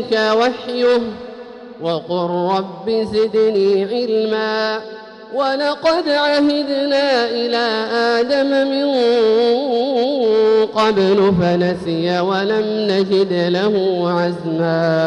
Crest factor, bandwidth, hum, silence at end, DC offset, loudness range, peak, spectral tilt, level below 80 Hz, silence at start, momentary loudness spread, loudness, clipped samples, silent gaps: 12 dB; 10.5 kHz; none; 0 s; under 0.1%; 3 LU; -4 dBFS; -6 dB/octave; -54 dBFS; 0 s; 7 LU; -16 LUFS; under 0.1%; none